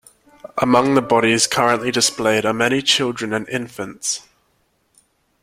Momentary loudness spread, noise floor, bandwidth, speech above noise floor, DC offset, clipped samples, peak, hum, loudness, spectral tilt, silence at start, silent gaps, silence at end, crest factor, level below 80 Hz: 11 LU; -64 dBFS; 16.5 kHz; 46 dB; under 0.1%; under 0.1%; -2 dBFS; none; -17 LUFS; -3 dB/octave; 0.55 s; none; 1.25 s; 18 dB; -56 dBFS